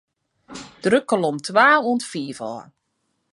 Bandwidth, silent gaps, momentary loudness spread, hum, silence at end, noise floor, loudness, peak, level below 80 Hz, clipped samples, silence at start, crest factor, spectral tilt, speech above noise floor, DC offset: 11.5 kHz; none; 23 LU; none; 0.7 s; -72 dBFS; -19 LUFS; -2 dBFS; -66 dBFS; under 0.1%; 0.5 s; 20 dB; -4.5 dB/octave; 53 dB; under 0.1%